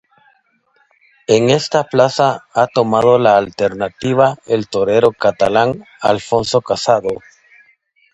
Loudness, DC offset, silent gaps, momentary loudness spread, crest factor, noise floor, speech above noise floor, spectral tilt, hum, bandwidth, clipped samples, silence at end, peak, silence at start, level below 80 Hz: -15 LUFS; under 0.1%; none; 7 LU; 16 dB; -59 dBFS; 45 dB; -5 dB/octave; none; 8.8 kHz; under 0.1%; 0.95 s; 0 dBFS; 1.3 s; -52 dBFS